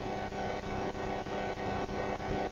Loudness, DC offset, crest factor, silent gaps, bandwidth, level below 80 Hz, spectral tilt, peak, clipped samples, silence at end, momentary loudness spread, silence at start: -37 LUFS; under 0.1%; 14 dB; none; 15.5 kHz; -48 dBFS; -6 dB/octave; -22 dBFS; under 0.1%; 0 s; 2 LU; 0 s